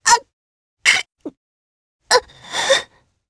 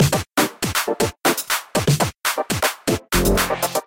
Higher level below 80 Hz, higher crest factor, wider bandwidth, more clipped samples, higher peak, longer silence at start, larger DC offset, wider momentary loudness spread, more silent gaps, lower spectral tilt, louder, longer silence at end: second, -58 dBFS vs -34 dBFS; about the same, 20 dB vs 16 dB; second, 11 kHz vs 17 kHz; neither; first, 0 dBFS vs -4 dBFS; about the same, 0.05 s vs 0 s; neither; first, 19 LU vs 3 LU; first, 0.33-0.77 s, 1.37-1.99 s vs none; second, 1 dB/octave vs -4 dB/octave; first, -17 LUFS vs -20 LUFS; first, 0.45 s vs 0.05 s